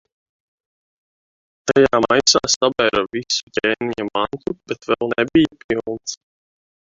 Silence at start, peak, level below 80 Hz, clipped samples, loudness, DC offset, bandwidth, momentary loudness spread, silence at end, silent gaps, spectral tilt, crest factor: 1.65 s; -2 dBFS; -52 dBFS; under 0.1%; -18 LUFS; under 0.1%; 8 kHz; 14 LU; 0.7 s; 2.56-2.61 s, 3.43-3.47 s, 5.64-5.69 s; -3 dB/octave; 18 dB